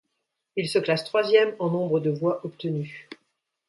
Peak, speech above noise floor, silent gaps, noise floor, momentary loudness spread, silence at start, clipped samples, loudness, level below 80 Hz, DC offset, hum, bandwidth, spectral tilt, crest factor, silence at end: -6 dBFS; 55 dB; none; -79 dBFS; 12 LU; 0.55 s; under 0.1%; -25 LUFS; -72 dBFS; under 0.1%; none; 11.5 kHz; -6 dB/octave; 20 dB; 0.55 s